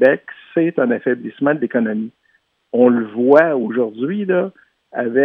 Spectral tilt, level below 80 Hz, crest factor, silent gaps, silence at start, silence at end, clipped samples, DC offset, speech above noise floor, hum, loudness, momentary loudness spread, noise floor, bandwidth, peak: -9.5 dB/octave; -72 dBFS; 16 dB; none; 0 s; 0 s; under 0.1%; under 0.1%; 46 dB; none; -17 LUFS; 11 LU; -62 dBFS; 5 kHz; 0 dBFS